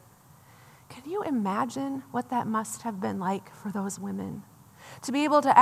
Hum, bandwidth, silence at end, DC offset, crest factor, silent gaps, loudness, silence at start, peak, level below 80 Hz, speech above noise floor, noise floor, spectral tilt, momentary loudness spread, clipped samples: none; 15 kHz; 0 s; under 0.1%; 24 dB; none; -30 LUFS; 0.9 s; -4 dBFS; -74 dBFS; 28 dB; -55 dBFS; -5 dB/octave; 17 LU; under 0.1%